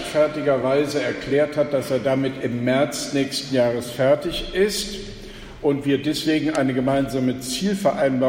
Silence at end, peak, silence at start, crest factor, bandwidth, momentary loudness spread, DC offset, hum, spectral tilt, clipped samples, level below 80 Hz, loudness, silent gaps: 0 s; -6 dBFS; 0 s; 16 dB; 16.5 kHz; 5 LU; under 0.1%; none; -5 dB/octave; under 0.1%; -46 dBFS; -22 LUFS; none